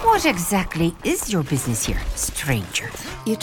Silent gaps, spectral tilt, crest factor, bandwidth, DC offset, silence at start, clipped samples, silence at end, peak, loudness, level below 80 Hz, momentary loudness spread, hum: none; -4 dB/octave; 16 dB; over 20 kHz; under 0.1%; 0 s; under 0.1%; 0 s; -6 dBFS; -22 LUFS; -34 dBFS; 7 LU; none